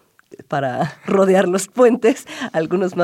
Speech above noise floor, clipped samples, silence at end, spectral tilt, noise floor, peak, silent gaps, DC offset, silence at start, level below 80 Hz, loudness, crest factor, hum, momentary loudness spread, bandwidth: 28 dB; under 0.1%; 0 s; -5.5 dB/octave; -44 dBFS; -4 dBFS; none; under 0.1%; 0.5 s; -66 dBFS; -18 LUFS; 14 dB; none; 10 LU; 16 kHz